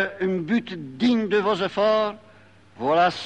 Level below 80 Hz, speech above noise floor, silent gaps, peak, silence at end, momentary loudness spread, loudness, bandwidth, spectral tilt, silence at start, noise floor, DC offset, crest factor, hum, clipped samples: -64 dBFS; 29 dB; none; -8 dBFS; 0 s; 9 LU; -23 LUFS; 9 kHz; -6 dB/octave; 0 s; -52 dBFS; 0.1%; 16 dB; none; under 0.1%